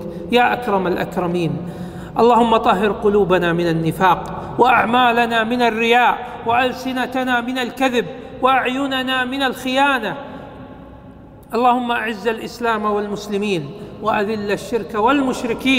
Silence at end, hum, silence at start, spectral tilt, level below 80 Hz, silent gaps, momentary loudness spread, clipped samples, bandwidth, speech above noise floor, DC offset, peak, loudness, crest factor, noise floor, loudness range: 0 s; none; 0 s; -5.5 dB/octave; -46 dBFS; none; 11 LU; under 0.1%; 16 kHz; 23 dB; under 0.1%; 0 dBFS; -18 LUFS; 18 dB; -40 dBFS; 5 LU